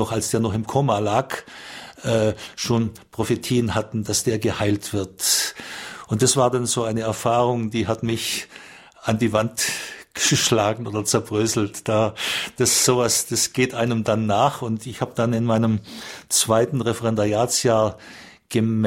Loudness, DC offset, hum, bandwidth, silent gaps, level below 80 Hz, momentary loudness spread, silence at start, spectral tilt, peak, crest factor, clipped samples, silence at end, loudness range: -21 LUFS; under 0.1%; none; 16.5 kHz; none; -52 dBFS; 11 LU; 0 s; -4 dB/octave; -4 dBFS; 18 dB; under 0.1%; 0 s; 3 LU